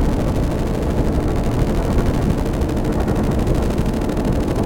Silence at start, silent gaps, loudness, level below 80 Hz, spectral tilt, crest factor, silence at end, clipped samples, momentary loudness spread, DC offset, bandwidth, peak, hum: 0 s; none; -20 LUFS; -22 dBFS; -7.5 dB/octave; 12 dB; 0 s; under 0.1%; 2 LU; under 0.1%; 17 kHz; -6 dBFS; none